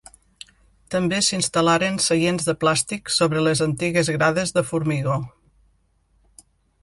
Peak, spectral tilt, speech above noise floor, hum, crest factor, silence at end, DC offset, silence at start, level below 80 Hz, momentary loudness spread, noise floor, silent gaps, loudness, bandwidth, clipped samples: -6 dBFS; -4 dB/octave; 42 dB; none; 18 dB; 1.55 s; under 0.1%; 0.9 s; -54 dBFS; 5 LU; -63 dBFS; none; -21 LUFS; 11.5 kHz; under 0.1%